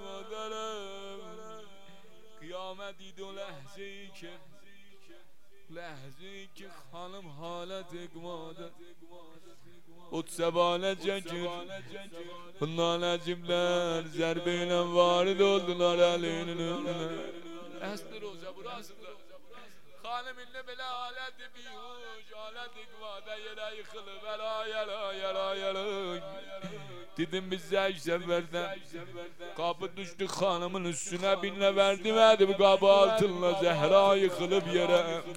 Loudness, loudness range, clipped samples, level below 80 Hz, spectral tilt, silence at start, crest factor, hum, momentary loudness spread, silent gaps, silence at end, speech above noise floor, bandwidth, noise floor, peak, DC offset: -30 LUFS; 21 LU; under 0.1%; -70 dBFS; -4.5 dB/octave; 0 s; 24 dB; none; 21 LU; none; 0 s; 31 dB; 16 kHz; -63 dBFS; -8 dBFS; 0.5%